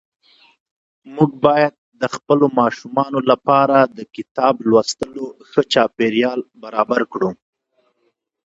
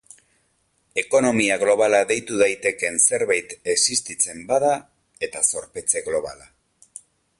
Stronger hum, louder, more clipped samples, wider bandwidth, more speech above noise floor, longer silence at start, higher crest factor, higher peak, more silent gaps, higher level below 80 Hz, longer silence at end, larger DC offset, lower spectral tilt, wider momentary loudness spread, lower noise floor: neither; first, -17 LUFS vs -20 LUFS; neither; second, 8 kHz vs 11.5 kHz; first, 50 dB vs 46 dB; about the same, 1.05 s vs 0.95 s; about the same, 18 dB vs 18 dB; first, 0 dBFS vs -4 dBFS; first, 1.78-1.92 s, 4.31-4.35 s vs none; about the same, -60 dBFS vs -60 dBFS; about the same, 1.15 s vs 1.05 s; neither; first, -5.5 dB/octave vs -2 dB/octave; about the same, 11 LU vs 10 LU; about the same, -67 dBFS vs -67 dBFS